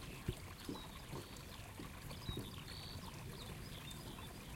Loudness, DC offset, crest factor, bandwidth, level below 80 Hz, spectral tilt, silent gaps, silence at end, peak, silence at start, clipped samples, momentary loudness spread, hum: -50 LUFS; under 0.1%; 22 dB; 16.5 kHz; -58 dBFS; -4.5 dB/octave; none; 0 s; -26 dBFS; 0 s; under 0.1%; 4 LU; none